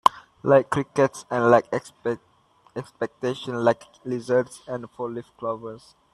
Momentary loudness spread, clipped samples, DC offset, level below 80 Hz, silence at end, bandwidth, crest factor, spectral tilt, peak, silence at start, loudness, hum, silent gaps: 15 LU; under 0.1%; under 0.1%; -64 dBFS; 0.35 s; 13 kHz; 24 dB; -6 dB/octave; 0 dBFS; 0.05 s; -25 LUFS; none; none